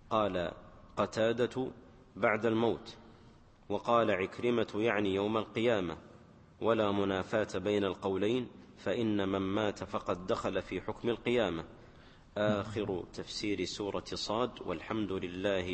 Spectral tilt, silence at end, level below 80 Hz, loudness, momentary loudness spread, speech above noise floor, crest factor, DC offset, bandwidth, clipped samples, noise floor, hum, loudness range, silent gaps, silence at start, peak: -5.5 dB/octave; 0 s; -60 dBFS; -34 LUFS; 10 LU; 26 dB; 20 dB; under 0.1%; 8.8 kHz; under 0.1%; -58 dBFS; none; 3 LU; none; 0.05 s; -14 dBFS